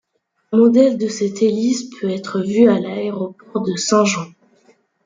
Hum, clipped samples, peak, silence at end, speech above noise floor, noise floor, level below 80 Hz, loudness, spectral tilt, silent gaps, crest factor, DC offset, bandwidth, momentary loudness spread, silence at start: none; under 0.1%; -2 dBFS; 0.8 s; 40 dB; -56 dBFS; -64 dBFS; -17 LUFS; -5 dB/octave; none; 16 dB; under 0.1%; 9.4 kHz; 11 LU; 0.5 s